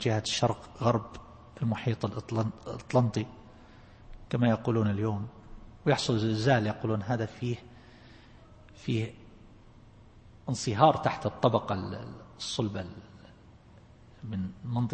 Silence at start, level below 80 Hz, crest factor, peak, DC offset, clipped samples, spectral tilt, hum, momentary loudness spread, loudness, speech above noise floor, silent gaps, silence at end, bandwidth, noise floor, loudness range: 0 s; -56 dBFS; 24 dB; -6 dBFS; under 0.1%; under 0.1%; -6 dB/octave; none; 16 LU; -30 LUFS; 26 dB; none; 0 s; 8.8 kHz; -55 dBFS; 8 LU